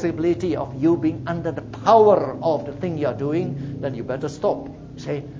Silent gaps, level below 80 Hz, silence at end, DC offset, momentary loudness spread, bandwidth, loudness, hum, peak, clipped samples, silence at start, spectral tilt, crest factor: none; -50 dBFS; 0 s; under 0.1%; 13 LU; 7.6 kHz; -22 LUFS; none; -2 dBFS; under 0.1%; 0 s; -8 dB/octave; 20 dB